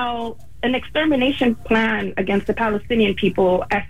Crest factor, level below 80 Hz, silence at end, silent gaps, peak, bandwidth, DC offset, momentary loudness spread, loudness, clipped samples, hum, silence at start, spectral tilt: 14 dB; -42 dBFS; 0 s; none; -6 dBFS; 14 kHz; 2%; 6 LU; -20 LUFS; under 0.1%; none; 0 s; -6.5 dB/octave